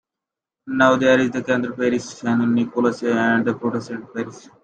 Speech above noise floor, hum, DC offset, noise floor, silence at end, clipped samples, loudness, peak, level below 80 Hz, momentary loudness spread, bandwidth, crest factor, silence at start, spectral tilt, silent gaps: 67 dB; none; under 0.1%; -86 dBFS; 0.25 s; under 0.1%; -20 LUFS; -4 dBFS; -64 dBFS; 13 LU; 8.8 kHz; 16 dB; 0.65 s; -5.5 dB/octave; none